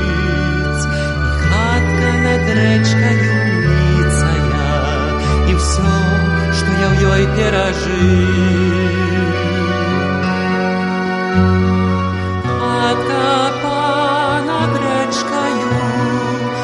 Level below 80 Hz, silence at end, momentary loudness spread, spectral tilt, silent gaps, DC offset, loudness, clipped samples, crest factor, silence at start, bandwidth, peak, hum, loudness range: -24 dBFS; 0 s; 4 LU; -6 dB/octave; none; under 0.1%; -15 LUFS; under 0.1%; 14 dB; 0 s; 11.5 kHz; 0 dBFS; none; 2 LU